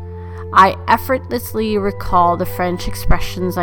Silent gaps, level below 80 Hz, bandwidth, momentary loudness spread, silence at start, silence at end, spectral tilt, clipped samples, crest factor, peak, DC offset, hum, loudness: none; -26 dBFS; 19 kHz; 11 LU; 0 s; 0 s; -5.5 dB/octave; under 0.1%; 16 dB; 0 dBFS; under 0.1%; none; -17 LUFS